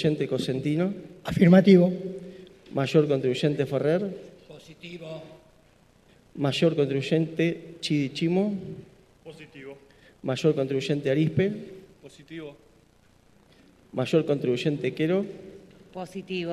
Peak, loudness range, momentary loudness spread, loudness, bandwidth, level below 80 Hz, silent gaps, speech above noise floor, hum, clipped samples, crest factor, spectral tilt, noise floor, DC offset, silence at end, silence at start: -4 dBFS; 8 LU; 21 LU; -25 LUFS; 12.5 kHz; -60 dBFS; none; 34 dB; none; under 0.1%; 22 dB; -7 dB/octave; -59 dBFS; under 0.1%; 0 s; 0 s